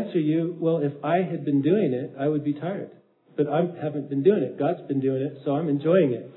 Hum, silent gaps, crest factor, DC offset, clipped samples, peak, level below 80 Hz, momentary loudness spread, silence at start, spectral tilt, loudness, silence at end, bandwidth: none; none; 18 dB; under 0.1%; under 0.1%; -8 dBFS; -78 dBFS; 7 LU; 0 s; -12 dB/octave; -25 LUFS; 0.05 s; 4.1 kHz